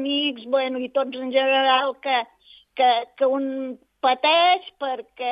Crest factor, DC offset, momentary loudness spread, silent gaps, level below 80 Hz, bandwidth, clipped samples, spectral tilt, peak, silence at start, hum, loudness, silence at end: 16 dB; under 0.1%; 12 LU; none; -74 dBFS; 5.4 kHz; under 0.1%; -5 dB/octave; -6 dBFS; 0 s; none; -22 LUFS; 0 s